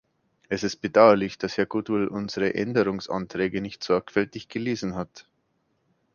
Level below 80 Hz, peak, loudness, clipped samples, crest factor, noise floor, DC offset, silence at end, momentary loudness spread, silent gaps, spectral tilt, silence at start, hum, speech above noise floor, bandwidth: -58 dBFS; -2 dBFS; -25 LUFS; under 0.1%; 24 dB; -72 dBFS; under 0.1%; 0.95 s; 13 LU; none; -6 dB/octave; 0.5 s; none; 47 dB; 7.2 kHz